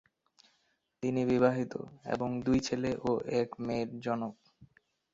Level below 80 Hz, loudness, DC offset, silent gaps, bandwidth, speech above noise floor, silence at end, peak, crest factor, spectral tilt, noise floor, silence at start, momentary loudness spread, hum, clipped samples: -62 dBFS; -33 LUFS; under 0.1%; none; 7.8 kHz; 44 dB; 0.5 s; -12 dBFS; 22 dB; -6.5 dB/octave; -76 dBFS; 1 s; 10 LU; none; under 0.1%